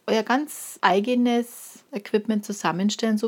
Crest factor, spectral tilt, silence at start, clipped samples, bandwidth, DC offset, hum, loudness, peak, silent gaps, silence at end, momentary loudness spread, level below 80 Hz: 22 dB; -4.5 dB/octave; 0.05 s; under 0.1%; 17.5 kHz; under 0.1%; none; -24 LUFS; -2 dBFS; none; 0 s; 14 LU; -80 dBFS